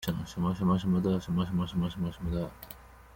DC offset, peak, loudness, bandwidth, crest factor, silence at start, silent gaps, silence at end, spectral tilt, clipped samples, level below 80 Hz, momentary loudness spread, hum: under 0.1%; -14 dBFS; -31 LUFS; 17 kHz; 16 dB; 0 s; none; 0.05 s; -7.5 dB/octave; under 0.1%; -48 dBFS; 14 LU; none